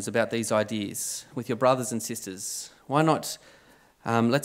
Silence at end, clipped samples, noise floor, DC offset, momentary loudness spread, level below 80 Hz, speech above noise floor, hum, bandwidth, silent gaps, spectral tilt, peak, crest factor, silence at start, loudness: 0 s; under 0.1%; -54 dBFS; under 0.1%; 11 LU; -72 dBFS; 28 dB; none; 16 kHz; none; -4.5 dB/octave; -8 dBFS; 20 dB; 0 s; -27 LUFS